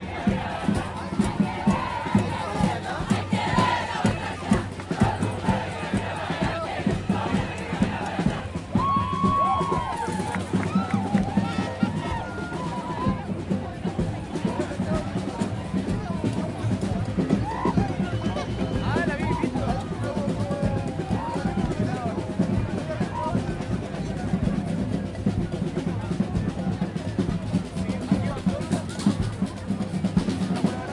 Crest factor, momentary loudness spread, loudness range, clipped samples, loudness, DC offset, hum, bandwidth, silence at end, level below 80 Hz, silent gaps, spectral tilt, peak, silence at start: 18 dB; 5 LU; 3 LU; under 0.1%; -26 LUFS; under 0.1%; none; 11.5 kHz; 0 s; -42 dBFS; none; -6.5 dB/octave; -8 dBFS; 0 s